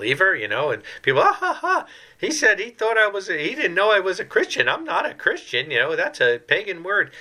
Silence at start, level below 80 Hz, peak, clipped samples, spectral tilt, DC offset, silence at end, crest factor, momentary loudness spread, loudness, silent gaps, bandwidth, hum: 0 s; -68 dBFS; -2 dBFS; under 0.1%; -3 dB/octave; under 0.1%; 0 s; 18 dB; 6 LU; -20 LUFS; none; 14 kHz; none